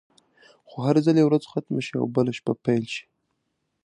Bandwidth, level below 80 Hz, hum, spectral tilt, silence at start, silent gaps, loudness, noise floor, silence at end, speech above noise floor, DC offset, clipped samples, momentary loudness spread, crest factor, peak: 10.5 kHz; -68 dBFS; none; -7.5 dB/octave; 0.7 s; none; -24 LUFS; -76 dBFS; 0.85 s; 54 dB; under 0.1%; under 0.1%; 12 LU; 20 dB; -6 dBFS